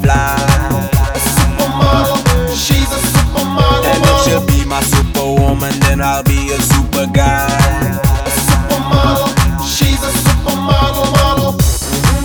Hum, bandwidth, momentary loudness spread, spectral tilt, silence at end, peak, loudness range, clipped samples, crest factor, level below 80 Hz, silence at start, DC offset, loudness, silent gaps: none; over 20 kHz; 3 LU; -4.5 dB/octave; 0 s; 0 dBFS; 1 LU; under 0.1%; 12 dB; -18 dBFS; 0 s; under 0.1%; -12 LUFS; none